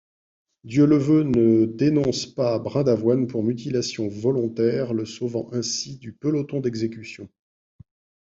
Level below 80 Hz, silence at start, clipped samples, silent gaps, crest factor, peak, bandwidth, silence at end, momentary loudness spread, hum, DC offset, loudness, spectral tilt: -58 dBFS; 0.65 s; under 0.1%; none; 16 dB; -6 dBFS; 7.8 kHz; 0.95 s; 11 LU; none; under 0.1%; -22 LUFS; -6.5 dB/octave